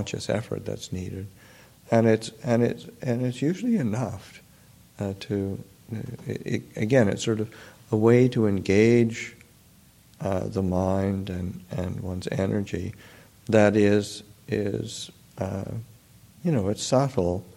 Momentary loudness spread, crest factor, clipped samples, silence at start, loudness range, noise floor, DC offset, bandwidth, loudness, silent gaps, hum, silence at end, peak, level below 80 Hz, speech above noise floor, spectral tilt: 16 LU; 20 dB; under 0.1%; 0 s; 7 LU; -55 dBFS; under 0.1%; 16.5 kHz; -26 LUFS; none; none; 0.05 s; -6 dBFS; -56 dBFS; 30 dB; -6.5 dB/octave